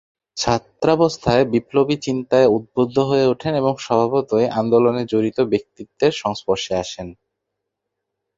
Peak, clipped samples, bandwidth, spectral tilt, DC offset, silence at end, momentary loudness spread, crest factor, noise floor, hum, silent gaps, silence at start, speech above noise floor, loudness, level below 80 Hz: -2 dBFS; under 0.1%; 7.8 kHz; -6 dB/octave; under 0.1%; 1.25 s; 8 LU; 18 dB; -79 dBFS; none; none; 0.35 s; 61 dB; -19 LUFS; -50 dBFS